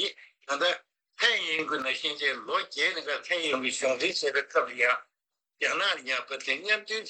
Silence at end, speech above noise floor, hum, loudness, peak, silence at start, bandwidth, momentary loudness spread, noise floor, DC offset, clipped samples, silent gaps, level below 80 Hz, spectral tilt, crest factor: 0 s; 58 dB; none; -28 LUFS; -10 dBFS; 0 s; 9.2 kHz; 6 LU; -87 dBFS; under 0.1%; under 0.1%; none; -86 dBFS; -0.5 dB/octave; 20 dB